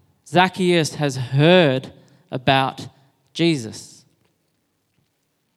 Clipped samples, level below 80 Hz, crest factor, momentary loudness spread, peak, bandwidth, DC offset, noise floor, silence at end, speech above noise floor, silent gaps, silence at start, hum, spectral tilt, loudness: under 0.1%; -62 dBFS; 22 dB; 20 LU; 0 dBFS; 13.5 kHz; under 0.1%; -70 dBFS; 1.7 s; 51 dB; none; 0.3 s; none; -5.5 dB/octave; -18 LUFS